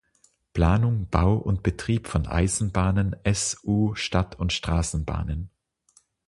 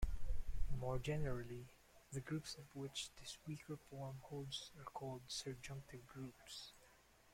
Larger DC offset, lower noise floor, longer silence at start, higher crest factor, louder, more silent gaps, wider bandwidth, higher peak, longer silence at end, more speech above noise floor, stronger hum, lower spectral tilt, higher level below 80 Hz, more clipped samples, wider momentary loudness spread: neither; second, -65 dBFS vs -69 dBFS; first, 0.55 s vs 0 s; about the same, 22 dB vs 18 dB; first, -25 LUFS vs -49 LUFS; neither; second, 11.5 kHz vs 16 kHz; first, -4 dBFS vs -26 dBFS; first, 0.8 s vs 0.45 s; first, 41 dB vs 21 dB; neither; about the same, -5.5 dB/octave vs -4.5 dB/octave; first, -34 dBFS vs -52 dBFS; neither; second, 7 LU vs 10 LU